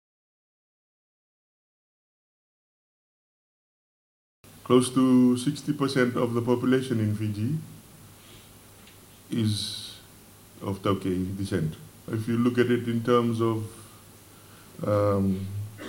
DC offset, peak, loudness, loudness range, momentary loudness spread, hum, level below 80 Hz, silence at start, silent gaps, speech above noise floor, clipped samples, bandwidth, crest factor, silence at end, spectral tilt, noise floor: under 0.1%; -6 dBFS; -26 LUFS; 8 LU; 15 LU; none; -62 dBFS; 4.55 s; none; 26 dB; under 0.1%; 17 kHz; 22 dB; 0 s; -6.5 dB/octave; -51 dBFS